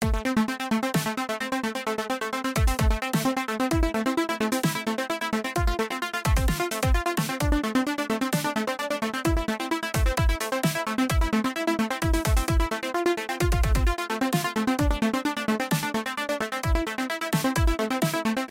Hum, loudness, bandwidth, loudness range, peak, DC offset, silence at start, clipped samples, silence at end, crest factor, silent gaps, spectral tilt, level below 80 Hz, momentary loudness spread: none; -26 LUFS; 16.5 kHz; 1 LU; -12 dBFS; under 0.1%; 0 s; under 0.1%; 0.05 s; 14 dB; none; -5 dB/octave; -30 dBFS; 4 LU